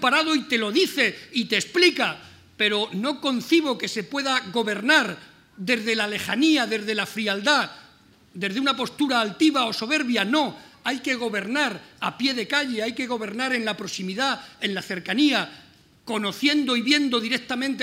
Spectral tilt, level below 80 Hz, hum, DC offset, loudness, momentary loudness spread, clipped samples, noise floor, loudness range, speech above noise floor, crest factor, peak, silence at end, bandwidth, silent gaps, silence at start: -3 dB/octave; -68 dBFS; none; under 0.1%; -23 LUFS; 9 LU; under 0.1%; -54 dBFS; 3 LU; 31 dB; 20 dB; -4 dBFS; 0 s; 16 kHz; none; 0 s